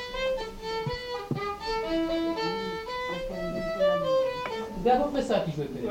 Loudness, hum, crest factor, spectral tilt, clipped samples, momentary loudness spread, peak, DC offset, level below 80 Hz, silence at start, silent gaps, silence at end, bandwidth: -29 LUFS; none; 18 dB; -5.5 dB/octave; under 0.1%; 8 LU; -12 dBFS; under 0.1%; -48 dBFS; 0 s; none; 0 s; 17 kHz